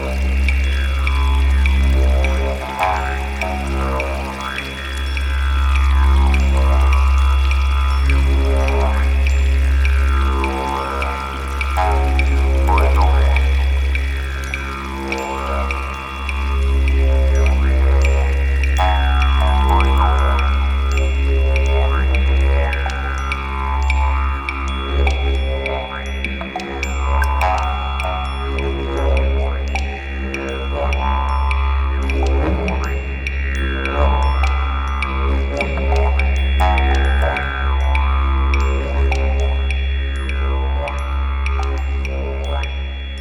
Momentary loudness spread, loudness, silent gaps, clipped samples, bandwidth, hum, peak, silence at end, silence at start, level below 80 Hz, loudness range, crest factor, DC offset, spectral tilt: 8 LU; -18 LUFS; none; under 0.1%; 9.6 kHz; none; -2 dBFS; 0 s; 0 s; -16 dBFS; 5 LU; 14 dB; under 0.1%; -6 dB/octave